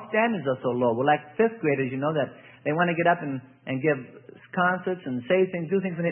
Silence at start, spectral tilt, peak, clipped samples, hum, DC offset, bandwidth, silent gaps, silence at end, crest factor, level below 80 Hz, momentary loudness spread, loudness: 0 s; -11 dB/octave; -8 dBFS; under 0.1%; none; under 0.1%; 3.5 kHz; none; 0 s; 18 dB; -72 dBFS; 10 LU; -26 LUFS